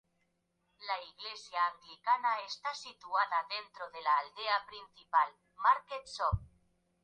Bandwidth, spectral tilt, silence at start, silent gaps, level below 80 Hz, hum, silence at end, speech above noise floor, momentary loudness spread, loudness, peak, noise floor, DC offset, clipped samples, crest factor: 9.4 kHz; -3 dB/octave; 0.8 s; none; -54 dBFS; none; 0.6 s; 45 dB; 13 LU; -34 LUFS; -14 dBFS; -79 dBFS; under 0.1%; under 0.1%; 20 dB